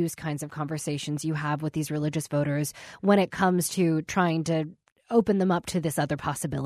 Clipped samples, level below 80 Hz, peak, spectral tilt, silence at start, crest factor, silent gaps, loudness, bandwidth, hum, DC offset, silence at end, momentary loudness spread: under 0.1%; -60 dBFS; -8 dBFS; -5.5 dB/octave; 0 s; 18 dB; 4.92-4.96 s; -27 LUFS; 14 kHz; none; under 0.1%; 0 s; 9 LU